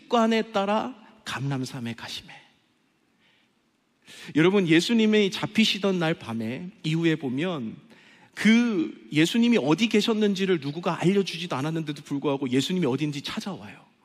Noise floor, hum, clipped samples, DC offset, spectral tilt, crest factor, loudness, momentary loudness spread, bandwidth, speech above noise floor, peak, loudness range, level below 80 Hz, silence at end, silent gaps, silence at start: -69 dBFS; none; under 0.1%; under 0.1%; -5.5 dB/octave; 20 dB; -25 LUFS; 14 LU; 14.5 kHz; 44 dB; -6 dBFS; 8 LU; -70 dBFS; 0.3 s; none; 0.1 s